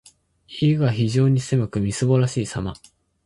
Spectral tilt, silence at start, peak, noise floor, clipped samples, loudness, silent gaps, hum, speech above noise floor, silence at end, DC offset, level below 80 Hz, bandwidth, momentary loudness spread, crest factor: -6.5 dB/octave; 0.5 s; -6 dBFS; -51 dBFS; under 0.1%; -21 LUFS; none; none; 31 dB; 0.5 s; under 0.1%; -48 dBFS; 11.5 kHz; 10 LU; 16 dB